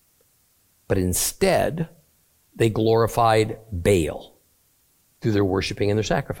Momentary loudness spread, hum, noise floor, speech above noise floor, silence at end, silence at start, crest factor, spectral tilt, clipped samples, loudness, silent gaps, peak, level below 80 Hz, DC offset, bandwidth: 9 LU; none; -63 dBFS; 42 dB; 0 s; 0.9 s; 18 dB; -5 dB/octave; under 0.1%; -22 LUFS; none; -6 dBFS; -44 dBFS; under 0.1%; 17 kHz